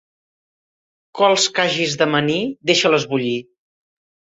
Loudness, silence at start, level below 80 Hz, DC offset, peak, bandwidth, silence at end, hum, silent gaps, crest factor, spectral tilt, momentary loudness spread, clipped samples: -17 LUFS; 1.15 s; -64 dBFS; under 0.1%; -2 dBFS; 8.4 kHz; 0.9 s; none; none; 18 dB; -3.5 dB/octave; 8 LU; under 0.1%